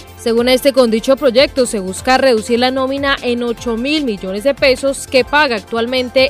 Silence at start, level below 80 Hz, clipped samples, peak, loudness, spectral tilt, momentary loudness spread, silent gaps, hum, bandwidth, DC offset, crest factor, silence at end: 0 s; -40 dBFS; under 0.1%; 0 dBFS; -14 LUFS; -3.5 dB/octave; 6 LU; none; none; 16 kHz; under 0.1%; 14 dB; 0 s